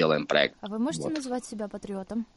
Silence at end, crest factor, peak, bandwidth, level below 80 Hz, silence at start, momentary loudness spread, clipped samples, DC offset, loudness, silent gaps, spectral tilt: 0.1 s; 22 dB; -6 dBFS; 11.5 kHz; -62 dBFS; 0 s; 13 LU; under 0.1%; under 0.1%; -29 LUFS; none; -4.5 dB/octave